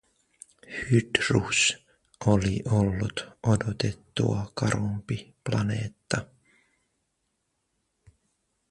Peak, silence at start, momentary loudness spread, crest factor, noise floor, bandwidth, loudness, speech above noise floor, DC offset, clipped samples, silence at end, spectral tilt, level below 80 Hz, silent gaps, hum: -2 dBFS; 0.7 s; 10 LU; 26 dB; -77 dBFS; 11.5 kHz; -27 LUFS; 51 dB; under 0.1%; under 0.1%; 2.45 s; -5 dB/octave; -48 dBFS; none; none